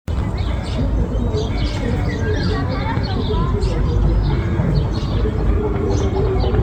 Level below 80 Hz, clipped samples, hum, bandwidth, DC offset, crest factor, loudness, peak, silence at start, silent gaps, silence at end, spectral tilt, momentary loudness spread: -22 dBFS; under 0.1%; none; 8.8 kHz; under 0.1%; 14 dB; -20 LUFS; -4 dBFS; 0.1 s; none; 0 s; -7.5 dB/octave; 3 LU